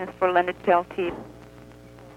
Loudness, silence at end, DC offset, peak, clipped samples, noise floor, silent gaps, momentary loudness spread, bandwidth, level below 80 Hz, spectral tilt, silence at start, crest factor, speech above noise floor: -24 LUFS; 0.05 s; under 0.1%; -6 dBFS; under 0.1%; -46 dBFS; none; 16 LU; 12.5 kHz; -56 dBFS; -6.5 dB/octave; 0 s; 20 dB; 22 dB